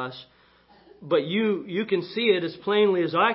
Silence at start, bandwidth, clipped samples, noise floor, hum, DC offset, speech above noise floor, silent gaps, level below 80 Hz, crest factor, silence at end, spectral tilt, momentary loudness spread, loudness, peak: 0 s; 5.8 kHz; under 0.1%; -57 dBFS; none; under 0.1%; 33 dB; none; -70 dBFS; 18 dB; 0 s; -10 dB/octave; 6 LU; -24 LUFS; -8 dBFS